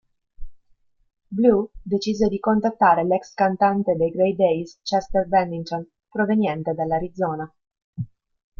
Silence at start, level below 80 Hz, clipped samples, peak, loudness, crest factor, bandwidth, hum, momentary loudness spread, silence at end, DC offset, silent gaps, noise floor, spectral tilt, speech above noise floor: 0.4 s; -48 dBFS; under 0.1%; -4 dBFS; -22 LUFS; 18 dB; 7.2 kHz; none; 14 LU; 0.55 s; under 0.1%; 7.84-7.93 s; -62 dBFS; -7 dB/octave; 41 dB